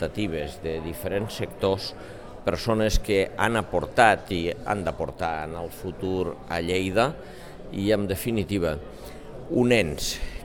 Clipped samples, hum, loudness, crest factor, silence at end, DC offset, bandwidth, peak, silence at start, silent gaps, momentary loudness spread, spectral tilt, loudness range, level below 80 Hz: under 0.1%; none; -26 LUFS; 22 dB; 0 s; 0.4%; 19 kHz; -4 dBFS; 0 s; none; 14 LU; -5 dB/octave; 4 LU; -40 dBFS